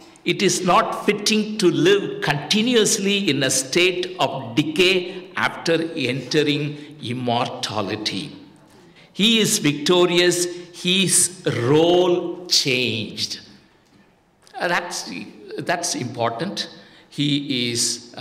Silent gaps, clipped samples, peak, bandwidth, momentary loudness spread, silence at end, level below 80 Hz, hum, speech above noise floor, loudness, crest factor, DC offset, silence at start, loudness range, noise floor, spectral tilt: none; under 0.1%; -6 dBFS; 16 kHz; 12 LU; 0 s; -60 dBFS; none; 36 dB; -20 LUFS; 16 dB; under 0.1%; 0 s; 8 LU; -56 dBFS; -3 dB/octave